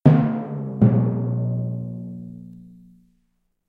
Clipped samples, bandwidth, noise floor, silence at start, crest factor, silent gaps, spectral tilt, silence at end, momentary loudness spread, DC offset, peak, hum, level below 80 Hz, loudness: under 0.1%; 4 kHz; -69 dBFS; 0.05 s; 20 dB; none; -12 dB/octave; 1 s; 20 LU; under 0.1%; -2 dBFS; none; -52 dBFS; -22 LUFS